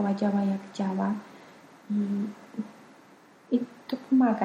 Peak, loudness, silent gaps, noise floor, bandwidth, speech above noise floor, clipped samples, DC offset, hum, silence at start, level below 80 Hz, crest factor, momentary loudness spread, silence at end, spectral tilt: -12 dBFS; -29 LUFS; none; -55 dBFS; 8.6 kHz; 28 dB; under 0.1%; under 0.1%; none; 0 s; -76 dBFS; 16 dB; 14 LU; 0 s; -8 dB/octave